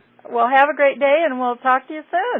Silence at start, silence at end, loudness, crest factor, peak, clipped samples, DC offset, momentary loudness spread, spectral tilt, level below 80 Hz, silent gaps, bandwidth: 0.3 s; 0 s; -17 LUFS; 14 dB; -4 dBFS; under 0.1%; under 0.1%; 8 LU; -5.5 dB/octave; -78 dBFS; none; 4 kHz